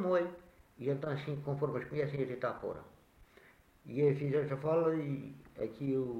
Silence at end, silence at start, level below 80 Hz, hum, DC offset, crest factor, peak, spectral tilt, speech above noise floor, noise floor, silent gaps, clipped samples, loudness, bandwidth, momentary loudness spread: 0 s; 0 s; -68 dBFS; none; under 0.1%; 16 dB; -18 dBFS; -9 dB/octave; 28 dB; -63 dBFS; none; under 0.1%; -36 LUFS; 6.8 kHz; 11 LU